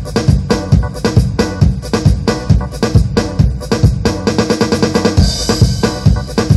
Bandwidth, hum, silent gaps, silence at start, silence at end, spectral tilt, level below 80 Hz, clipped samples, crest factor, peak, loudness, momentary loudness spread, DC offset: 12.5 kHz; none; none; 0 s; 0 s; -6 dB/octave; -20 dBFS; under 0.1%; 12 dB; 0 dBFS; -13 LUFS; 3 LU; under 0.1%